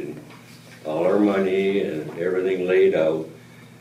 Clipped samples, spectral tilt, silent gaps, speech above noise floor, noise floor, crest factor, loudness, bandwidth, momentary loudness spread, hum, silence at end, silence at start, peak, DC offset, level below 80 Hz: under 0.1%; -7 dB/octave; none; 24 dB; -44 dBFS; 14 dB; -21 LUFS; 11.5 kHz; 17 LU; none; 0.15 s; 0 s; -8 dBFS; under 0.1%; -68 dBFS